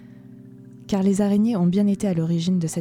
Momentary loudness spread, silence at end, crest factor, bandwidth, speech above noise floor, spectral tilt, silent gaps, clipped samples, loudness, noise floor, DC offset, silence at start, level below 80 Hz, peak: 3 LU; 0 s; 12 dB; 13 kHz; 23 dB; -7 dB/octave; none; under 0.1%; -21 LUFS; -43 dBFS; under 0.1%; 0 s; -56 dBFS; -10 dBFS